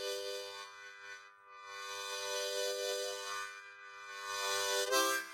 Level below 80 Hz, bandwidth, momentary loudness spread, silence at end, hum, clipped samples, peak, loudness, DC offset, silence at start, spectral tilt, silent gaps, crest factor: under -90 dBFS; 16.5 kHz; 18 LU; 0 s; none; under 0.1%; -18 dBFS; -37 LUFS; under 0.1%; 0 s; 1 dB/octave; none; 22 dB